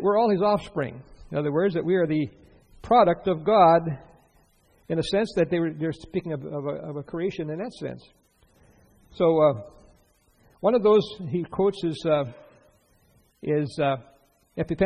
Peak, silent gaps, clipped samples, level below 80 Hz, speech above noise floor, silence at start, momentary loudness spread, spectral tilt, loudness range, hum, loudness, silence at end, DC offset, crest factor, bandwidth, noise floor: -6 dBFS; none; under 0.1%; -54 dBFS; 38 dB; 0 s; 15 LU; -7.5 dB/octave; 7 LU; none; -24 LUFS; 0 s; under 0.1%; 20 dB; 10 kHz; -62 dBFS